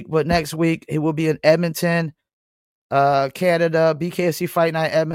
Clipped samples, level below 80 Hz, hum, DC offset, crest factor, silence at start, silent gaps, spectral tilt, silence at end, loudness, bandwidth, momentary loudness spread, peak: under 0.1%; -48 dBFS; none; under 0.1%; 18 dB; 0 s; 2.33-2.90 s; -6 dB/octave; 0 s; -19 LUFS; 16.5 kHz; 5 LU; -2 dBFS